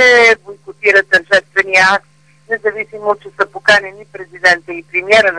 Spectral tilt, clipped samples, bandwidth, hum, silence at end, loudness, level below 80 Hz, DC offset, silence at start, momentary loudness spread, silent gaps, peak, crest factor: -2 dB/octave; under 0.1%; 10.5 kHz; none; 0 s; -12 LUFS; -52 dBFS; 0.2%; 0 s; 11 LU; none; 0 dBFS; 14 dB